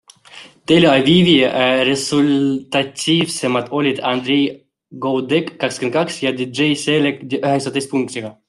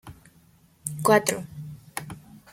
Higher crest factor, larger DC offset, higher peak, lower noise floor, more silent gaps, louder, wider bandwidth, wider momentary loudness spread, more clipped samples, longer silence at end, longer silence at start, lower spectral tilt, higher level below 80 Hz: second, 16 dB vs 24 dB; neither; about the same, -2 dBFS vs -4 dBFS; second, -42 dBFS vs -58 dBFS; neither; first, -16 LUFS vs -25 LUFS; second, 12.5 kHz vs 16.5 kHz; second, 10 LU vs 21 LU; neither; about the same, 0.15 s vs 0.15 s; first, 0.35 s vs 0.05 s; about the same, -5 dB/octave vs -4 dB/octave; about the same, -56 dBFS vs -60 dBFS